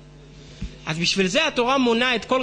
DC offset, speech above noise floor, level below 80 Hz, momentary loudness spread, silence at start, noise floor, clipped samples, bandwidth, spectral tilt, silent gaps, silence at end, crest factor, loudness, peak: under 0.1%; 24 dB; -44 dBFS; 16 LU; 0.05 s; -44 dBFS; under 0.1%; 10 kHz; -3.5 dB/octave; none; 0 s; 16 dB; -20 LUFS; -8 dBFS